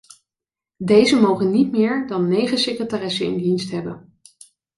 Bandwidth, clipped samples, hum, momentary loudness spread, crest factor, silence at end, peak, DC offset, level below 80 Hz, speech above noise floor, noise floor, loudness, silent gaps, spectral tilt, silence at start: 11.5 kHz; under 0.1%; none; 13 LU; 18 dB; 0.8 s; -2 dBFS; under 0.1%; -60 dBFS; 71 dB; -89 dBFS; -19 LUFS; none; -5.5 dB/octave; 0.8 s